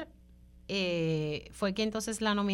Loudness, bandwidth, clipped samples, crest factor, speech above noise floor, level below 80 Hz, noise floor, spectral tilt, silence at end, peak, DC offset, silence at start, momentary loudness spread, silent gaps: -32 LUFS; 14 kHz; under 0.1%; 16 dB; 25 dB; -56 dBFS; -56 dBFS; -5 dB/octave; 0 s; -18 dBFS; under 0.1%; 0 s; 8 LU; none